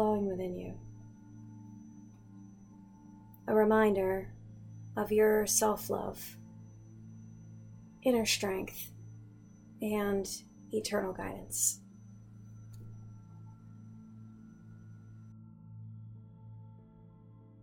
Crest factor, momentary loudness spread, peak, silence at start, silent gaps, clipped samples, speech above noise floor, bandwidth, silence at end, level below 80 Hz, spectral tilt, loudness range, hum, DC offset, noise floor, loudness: 22 dB; 26 LU; -14 dBFS; 0 s; none; under 0.1%; 25 dB; 18 kHz; 0.25 s; -60 dBFS; -4 dB/octave; 22 LU; none; under 0.1%; -56 dBFS; -32 LUFS